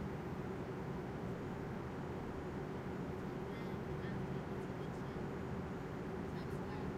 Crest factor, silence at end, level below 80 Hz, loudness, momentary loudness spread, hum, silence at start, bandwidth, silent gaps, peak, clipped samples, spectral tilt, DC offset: 14 dB; 0 s; -58 dBFS; -44 LUFS; 1 LU; none; 0 s; 14.5 kHz; none; -30 dBFS; under 0.1%; -7.5 dB/octave; under 0.1%